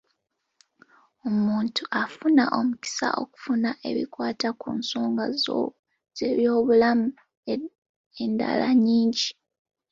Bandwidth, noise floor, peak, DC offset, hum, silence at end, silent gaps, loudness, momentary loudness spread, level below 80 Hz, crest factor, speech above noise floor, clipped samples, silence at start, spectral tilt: 7.8 kHz; -77 dBFS; -8 dBFS; under 0.1%; none; 0.6 s; 5.79-5.83 s, 7.37-7.43 s, 7.78-7.82 s, 7.89-8.11 s; -25 LUFS; 12 LU; -68 dBFS; 18 dB; 53 dB; under 0.1%; 1.25 s; -4.5 dB/octave